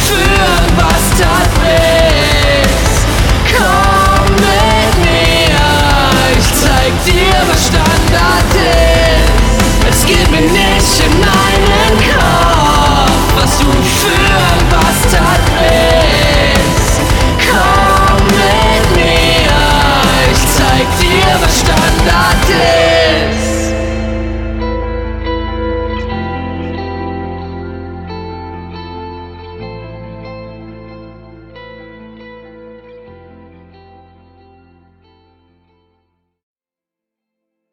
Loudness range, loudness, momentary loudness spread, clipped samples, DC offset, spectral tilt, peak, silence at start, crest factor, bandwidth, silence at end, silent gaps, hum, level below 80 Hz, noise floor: 15 LU; -9 LUFS; 16 LU; under 0.1%; under 0.1%; -4 dB/octave; 0 dBFS; 0 s; 10 dB; 19 kHz; 4.6 s; none; none; -16 dBFS; -87 dBFS